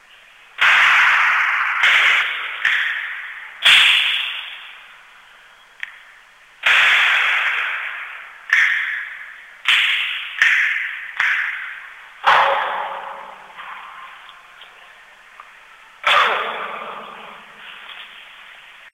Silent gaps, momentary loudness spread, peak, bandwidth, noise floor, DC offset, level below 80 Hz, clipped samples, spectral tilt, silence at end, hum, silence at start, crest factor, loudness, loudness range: none; 24 LU; 0 dBFS; 16 kHz; -47 dBFS; under 0.1%; -64 dBFS; under 0.1%; 1.5 dB/octave; 0.05 s; none; 0.6 s; 20 dB; -15 LUFS; 8 LU